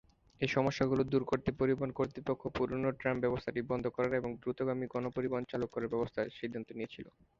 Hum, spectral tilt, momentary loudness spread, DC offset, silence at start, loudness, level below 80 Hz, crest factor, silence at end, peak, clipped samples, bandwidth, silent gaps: none; -7 dB/octave; 8 LU; under 0.1%; 0.4 s; -35 LUFS; -60 dBFS; 20 dB; 0.3 s; -16 dBFS; under 0.1%; 7.4 kHz; none